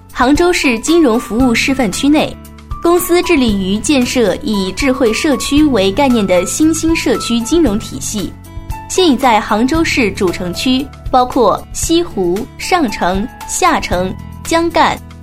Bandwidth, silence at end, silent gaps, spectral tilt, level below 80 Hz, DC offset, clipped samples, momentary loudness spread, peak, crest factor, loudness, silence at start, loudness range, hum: 16 kHz; 0 s; none; -4 dB/octave; -30 dBFS; under 0.1%; under 0.1%; 8 LU; 0 dBFS; 12 dB; -13 LUFS; 0.1 s; 2 LU; none